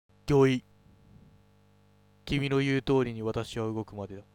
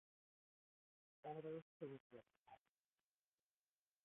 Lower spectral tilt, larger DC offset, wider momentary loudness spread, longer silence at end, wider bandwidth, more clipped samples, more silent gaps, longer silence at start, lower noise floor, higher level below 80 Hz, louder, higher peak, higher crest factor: first, -7 dB/octave vs -5 dB/octave; neither; about the same, 14 LU vs 13 LU; second, 0.15 s vs 1.5 s; first, 13.5 kHz vs 3.8 kHz; neither; second, none vs 1.62-1.80 s, 2.00-2.10 s, 2.39-2.44 s; second, 0.25 s vs 1.25 s; second, -62 dBFS vs under -90 dBFS; first, -52 dBFS vs under -90 dBFS; first, -29 LUFS vs -55 LUFS; first, -10 dBFS vs -40 dBFS; about the same, 20 dB vs 20 dB